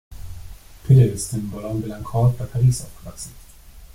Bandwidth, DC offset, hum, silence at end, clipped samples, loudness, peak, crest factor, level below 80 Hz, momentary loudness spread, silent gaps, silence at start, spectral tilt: 15.5 kHz; under 0.1%; none; 0.1 s; under 0.1%; -20 LUFS; -4 dBFS; 18 dB; -40 dBFS; 24 LU; none; 0.1 s; -7 dB/octave